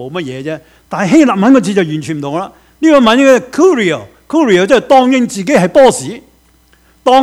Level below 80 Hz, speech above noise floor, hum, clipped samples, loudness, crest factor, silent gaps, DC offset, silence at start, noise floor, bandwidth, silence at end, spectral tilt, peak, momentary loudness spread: -48 dBFS; 39 dB; none; 0.8%; -10 LUFS; 10 dB; none; under 0.1%; 0 s; -49 dBFS; 14.5 kHz; 0 s; -5 dB/octave; 0 dBFS; 14 LU